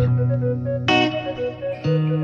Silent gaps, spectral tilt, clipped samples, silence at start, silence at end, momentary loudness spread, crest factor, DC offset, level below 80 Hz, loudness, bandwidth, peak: none; -7 dB/octave; under 0.1%; 0 s; 0 s; 9 LU; 16 dB; under 0.1%; -46 dBFS; -21 LUFS; 7.2 kHz; -4 dBFS